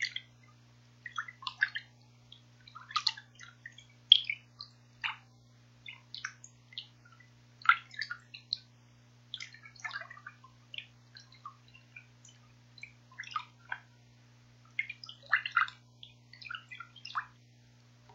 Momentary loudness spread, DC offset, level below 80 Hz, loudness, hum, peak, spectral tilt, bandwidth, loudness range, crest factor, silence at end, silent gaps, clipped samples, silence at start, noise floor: 25 LU; under 0.1%; -78 dBFS; -34 LUFS; 60 Hz at -60 dBFS; -4 dBFS; 0 dB/octave; 15.5 kHz; 16 LU; 36 dB; 0 s; none; under 0.1%; 0 s; -61 dBFS